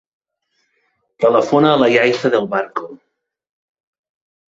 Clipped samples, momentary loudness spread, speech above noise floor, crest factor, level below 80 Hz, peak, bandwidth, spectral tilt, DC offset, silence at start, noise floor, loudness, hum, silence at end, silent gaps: under 0.1%; 14 LU; 54 dB; 18 dB; -62 dBFS; 0 dBFS; 7.8 kHz; -6 dB/octave; under 0.1%; 1.2 s; -68 dBFS; -15 LUFS; none; 1.55 s; none